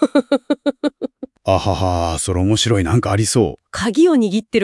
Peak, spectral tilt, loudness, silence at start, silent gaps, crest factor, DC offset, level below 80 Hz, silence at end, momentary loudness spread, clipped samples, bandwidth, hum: 0 dBFS; -5.5 dB/octave; -17 LUFS; 0 s; none; 16 dB; under 0.1%; -42 dBFS; 0 s; 10 LU; under 0.1%; 12 kHz; none